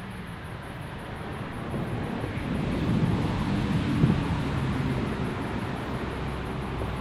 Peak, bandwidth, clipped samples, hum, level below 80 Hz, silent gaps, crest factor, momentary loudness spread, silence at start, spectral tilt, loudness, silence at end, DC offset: -10 dBFS; 13.5 kHz; under 0.1%; none; -40 dBFS; none; 20 dB; 13 LU; 0 s; -7.5 dB/octave; -30 LUFS; 0 s; under 0.1%